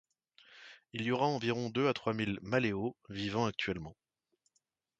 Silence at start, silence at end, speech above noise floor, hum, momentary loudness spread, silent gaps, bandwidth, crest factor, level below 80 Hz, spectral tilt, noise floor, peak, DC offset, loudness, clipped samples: 0.5 s; 1.1 s; 46 dB; none; 16 LU; none; 8.8 kHz; 20 dB; -64 dBFS; -6 dB/octave; -81 dBFS; -16 dBFS; under 0.1%; -35 LUFS; under 0.1%